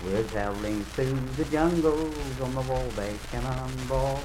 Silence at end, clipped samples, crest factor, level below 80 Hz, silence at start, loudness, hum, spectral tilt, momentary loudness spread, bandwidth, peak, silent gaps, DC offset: 0 s; under 0.1%; 18 dB; -38 dBFS; 0 s; -29 LUFS; none; -6 dB/octave; 8 LU; 16.5 kHz; -10 dBFS; none; under 0.1%